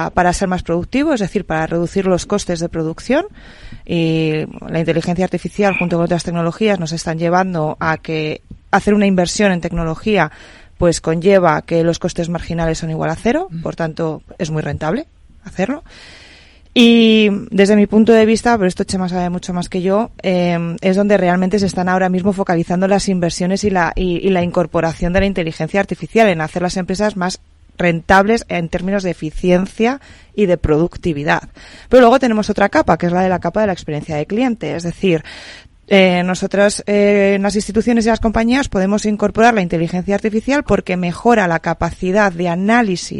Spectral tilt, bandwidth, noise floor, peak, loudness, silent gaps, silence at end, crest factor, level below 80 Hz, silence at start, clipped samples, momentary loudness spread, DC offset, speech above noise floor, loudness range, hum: -5.5 dB/octave; 11.5 kHz; -43 dBFS; 0 dBFS; -16 LUFS; none; 0 s; 16 dB; -36 dBFS; 0 s; 0.1%; 9 LU; under 0.1%; 28 dB; 5 LU; none